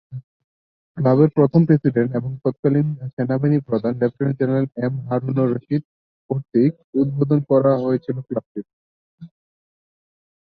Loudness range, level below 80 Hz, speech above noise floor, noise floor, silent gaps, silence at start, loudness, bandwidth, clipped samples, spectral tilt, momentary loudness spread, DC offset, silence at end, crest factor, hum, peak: 4 LU; -58 dBFS; over 71 dB; under -90 dBFS; 0.24-0.95 s, 2.59-2.63 s, 3.13-3.17 s, 5.85-6.29 s, 6.84-6.93 s, 8.46-8.55 s, 8.73-9.18 s; 0.1 s; -20 LUFS; 5 kHz; under 0.1%; -12.5 dB/octave; 12 LU; under 0.1%; 1.15 s; 18 dB; none; -2 dBFS